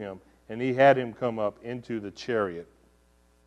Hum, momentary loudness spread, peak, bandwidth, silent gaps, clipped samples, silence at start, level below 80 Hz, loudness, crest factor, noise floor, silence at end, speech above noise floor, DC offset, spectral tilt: none; 20 LU; -6 dBFS; 8.4 kHz; none; under 0.1%; 0 s; -64 dBFS; -27 LUFS; 22 dB; -63 dBFS; 0.8 s; 36 dB; under 0.1%; -6.5 dB/octave